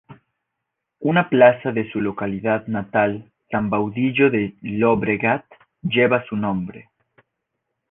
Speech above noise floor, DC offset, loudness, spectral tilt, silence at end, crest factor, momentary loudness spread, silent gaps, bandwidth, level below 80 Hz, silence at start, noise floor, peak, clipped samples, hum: 61 dB; under 0.1%; -20 LUFS; -10 dB/octave; 1.1 s; 18 dB; 12 LU; none; 3.9 kHz; -56 dBFS; 0.1 s; -80 dBFS; -2 dBFS; under 0.1%; none